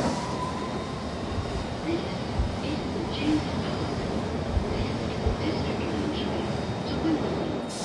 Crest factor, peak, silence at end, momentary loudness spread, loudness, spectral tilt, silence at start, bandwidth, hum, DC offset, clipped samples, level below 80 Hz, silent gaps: 16 dB; -12 dBFS; 0 s; 5 LU; -29 LUFS; -6 dB/octave; 0 s; 11.5 kHz; none; under 0.1%; under 0.1%; -40 dBFS; none